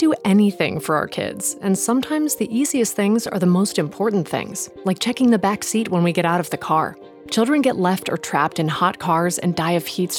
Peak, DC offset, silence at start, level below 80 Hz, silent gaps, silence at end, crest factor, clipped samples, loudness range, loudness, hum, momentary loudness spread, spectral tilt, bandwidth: -4 dBFS; under 0.1%; 0 s; -60 dBFS; none; 0 s; 16 dB; under 0.1%; 1 LU; -20 LUFS; none; 6 LU; -5 dB/octave; 19 kHz